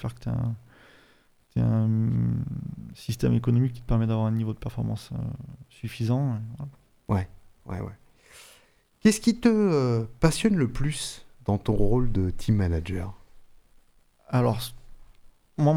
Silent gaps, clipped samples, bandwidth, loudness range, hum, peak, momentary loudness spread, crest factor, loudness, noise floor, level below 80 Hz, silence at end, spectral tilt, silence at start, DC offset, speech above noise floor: none; under 0.1%; 15.5 kHz; 7 LU; none; -6 dBFS; 16 LU; 22 dB; -26 LUFS; -61 dBFS; -40 dBFS; 0 s; -7 dB/octave; 0 s; under 0.1%; 36 dB